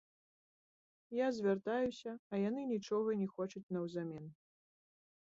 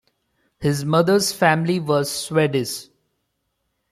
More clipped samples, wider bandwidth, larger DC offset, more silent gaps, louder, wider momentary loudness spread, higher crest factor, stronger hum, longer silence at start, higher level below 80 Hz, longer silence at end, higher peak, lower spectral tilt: neither; second, 7.6 kHz vs 15.5 kHz; neither; first, 2.19-2.30 s, 3.63-3.69 s vs none; second, -39 LUFS vs -20 LUFS; about the same, 10 LU vs 8 LU; about the same, 16 dB vs 18 dB; neither; first, 1.1 s vs 0.6 s; second, -78 dBFS vs -58 dBFS; second, 0.95 s vs 1.1 s; second, -24 dBFS vs -4 dBFS; about the same, -6 dB/octave vs -5 dB/octave